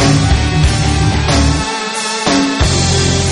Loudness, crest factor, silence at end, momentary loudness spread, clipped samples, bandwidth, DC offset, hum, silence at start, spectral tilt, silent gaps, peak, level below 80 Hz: -13 LUFS; 12 dB; 0 s; 4 LU; under 0.1%; 11.5 kHz; under 0.1%; none; 0 s; -4.5 dB/octave; none; 0 dBFS; -20 dBFS